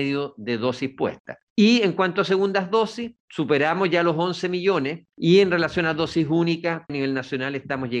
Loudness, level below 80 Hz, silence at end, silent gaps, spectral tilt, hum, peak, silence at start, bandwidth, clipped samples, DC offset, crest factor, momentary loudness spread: -22 LUFS; -60 dBFS; 0 s; 1.20-1.25 s, 1.42-1.56 s, 3.20-3.28 s; -6 dB/octave; none; -4 dBFS; 0 s; 9 kHz; under 0.1%; under 0.1%; 18 dB; 11 LU